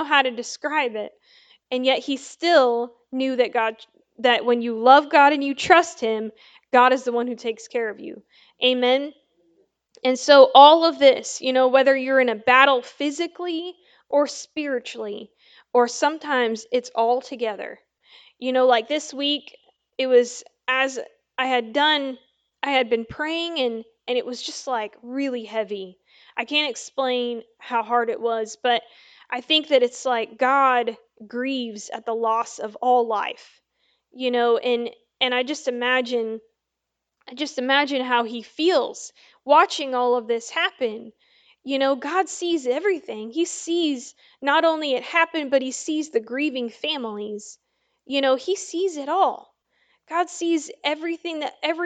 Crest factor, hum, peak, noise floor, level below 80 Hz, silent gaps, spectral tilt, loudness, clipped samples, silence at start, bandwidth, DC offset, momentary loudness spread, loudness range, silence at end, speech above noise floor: 22 dB; none; 0 dBFS; -82 dBFS; -72 dBFS; none; -2 dB/octave; -21 LUFS; under 0.1%; 0 s; 9.2 kHz; under 0.1%; 14 LU; 9 LU; 0 s; 60 dB